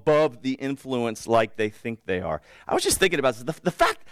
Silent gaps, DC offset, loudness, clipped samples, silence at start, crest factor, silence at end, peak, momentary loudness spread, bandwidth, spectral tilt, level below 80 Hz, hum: none; under 0.1%; -25 LUFS; under 0.1%; 0.05 s; 18 dB; 0 s; -6 dBFS; 9 LU; 16 kHz; -4 dB/octave; -50 dBFS; none